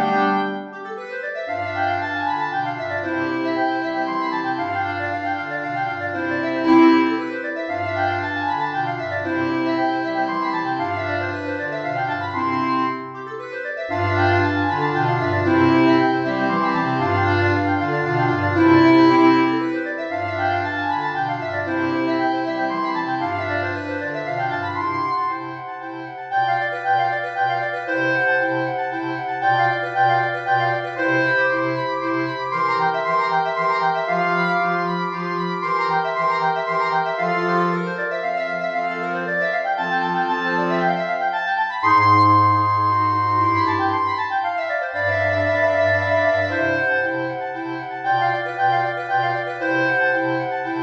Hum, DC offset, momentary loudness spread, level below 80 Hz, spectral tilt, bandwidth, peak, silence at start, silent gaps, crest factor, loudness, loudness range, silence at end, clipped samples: none; under 0.1%; 8 LU; -66 dBFS; -7 dB/octave; 7.4 kHz; -4 dBFS; 0 s; none; 16 dB; -20 LUFS; 6 LU; 0 s; under 0.1%